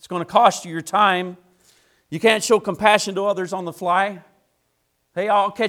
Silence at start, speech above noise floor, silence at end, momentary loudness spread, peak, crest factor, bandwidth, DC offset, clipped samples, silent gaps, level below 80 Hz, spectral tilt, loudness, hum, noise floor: 0.05 s; 50 dB; 0 s; 12 LU; 0 dBFS; 20 dB; 16.5 kHz; under 0.1%; under 0.1%; none; -64 dBFS; -3.5 dB/octave; -19 LUFS; none; -69 dBFS